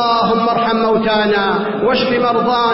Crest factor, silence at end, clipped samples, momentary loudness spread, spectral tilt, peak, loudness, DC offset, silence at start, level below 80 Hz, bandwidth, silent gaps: 10 dB; 0 s; under 0.1%; 2 LU; -9 dB/octave; -4 dBFS; -14 LUFS; under 0.1%; 0 s; -46 dBFS; 5.8 kHz; none